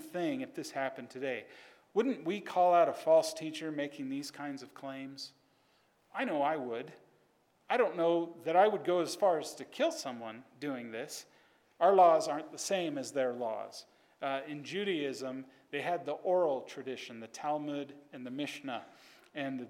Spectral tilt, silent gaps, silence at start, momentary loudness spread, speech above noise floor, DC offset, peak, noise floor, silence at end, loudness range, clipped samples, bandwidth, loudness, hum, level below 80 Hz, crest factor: -4 dB/octave; none; 0 s; 17 LU; 38 dB; under 0.1%; -14 dBFS; -71 dBFS; 0 s; 7 LU; under 0.1%; 16.5 kHz; -33 LUFS; none; under -90 dBFS; 20 dB